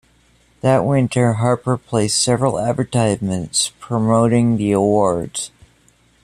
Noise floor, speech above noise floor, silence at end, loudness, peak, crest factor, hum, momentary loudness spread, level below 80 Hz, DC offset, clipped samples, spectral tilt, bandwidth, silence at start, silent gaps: -55 dBFS; 39 dB; 0.75 s; -17 LUFS; -2 dBFS; 16 dB; none; 6 LU; -50 dBFS; under 0.1%; under 0.1%; -5.5 dB/octave; 14 kHz; 0.65 s; none